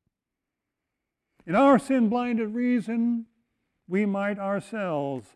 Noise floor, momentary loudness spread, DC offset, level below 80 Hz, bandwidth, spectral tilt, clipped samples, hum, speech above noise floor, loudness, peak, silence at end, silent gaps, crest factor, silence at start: -86 dBFS; 10 LU; under 0.1%; -68 dBFS; 11.5 kHz; -7.5 dB/octave; under 0.1%; none; 62 dB; -25 LUFS; -10 dBFS; 0.15 s; none; 16 dB; 1.45 s